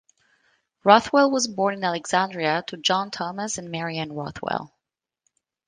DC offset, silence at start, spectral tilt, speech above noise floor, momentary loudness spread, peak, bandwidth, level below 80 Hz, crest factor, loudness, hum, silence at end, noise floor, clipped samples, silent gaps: under 0.1%; 0.85 s; -3.5 dB/octave; 62 dB; 12 LU; 0 dBFS; 10 kHz; -64 dBFS; 24 dB; -23 LUFS; none; 1 s; -85 dBFS; under 0.1%; none